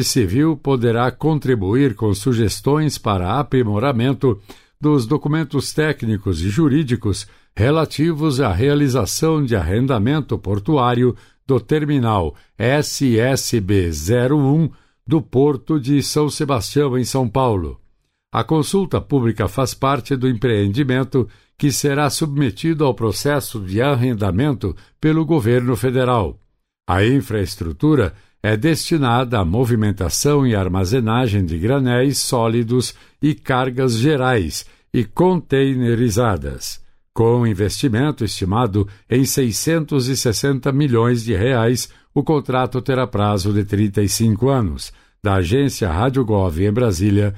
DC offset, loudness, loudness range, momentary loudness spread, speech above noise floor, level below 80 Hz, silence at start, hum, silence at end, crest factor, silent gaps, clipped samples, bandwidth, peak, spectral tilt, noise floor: under 0.1%; -18 LUFS; 2 LU; 6 LU; 40 dB; -38 dBFS; 0 s; none; 0 s; 12 dB; none; under 0.1%; 16 kHz; -6 dBFS; -6 dB/octave; -57 dBFS